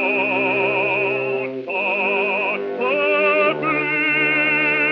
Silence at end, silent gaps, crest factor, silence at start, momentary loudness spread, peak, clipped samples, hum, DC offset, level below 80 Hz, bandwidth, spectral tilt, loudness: 0 s; none; 14 dB; 0 s; 6 LU; -6 dBFS; under 0.1%; none; under 0.1%; -68 dBFS; 6 kHz; -2 dB/octave; -18 LUFS